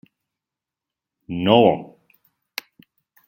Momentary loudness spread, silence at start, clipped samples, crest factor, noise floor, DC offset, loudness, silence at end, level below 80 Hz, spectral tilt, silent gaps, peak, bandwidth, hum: 19 LU; 1.3 s; under 0.1%; 22 dB; -88 dBFS; under 0.1%; -18 LUFS; 1.45 s; -62 dBFS; -6.5 dB/octave; none; -2 dBFS; 16.5 kHz; none